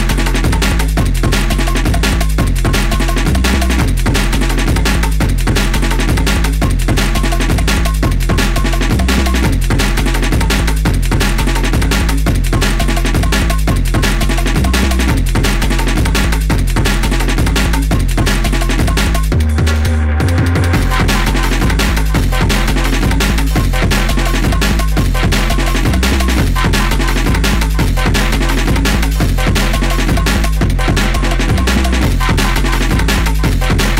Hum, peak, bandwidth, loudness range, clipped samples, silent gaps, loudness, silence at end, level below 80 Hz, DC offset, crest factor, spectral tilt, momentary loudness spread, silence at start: none; -2 dBFS; 16.5 kHz; 1 LU; under 0.1%; none; -14 LUFS; 0 s; -14 dBFS; under 0.1%; 10 dB; -5 dB/octave; 2 LU; 0 s